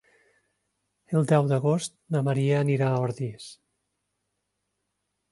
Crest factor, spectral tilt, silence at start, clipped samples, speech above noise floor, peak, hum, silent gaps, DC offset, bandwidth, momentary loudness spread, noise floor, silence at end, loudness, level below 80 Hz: 20 dB; -7 dB/octave; 1.1 s; under 0.1%; 55 dB; -8 dBFS; 50 Hz at -65 dBFS; none; under 0.1%; 11.5 kHz; 12 LU; -80 dBFS; 1.75 s; -25 LUFS; -68 dBFS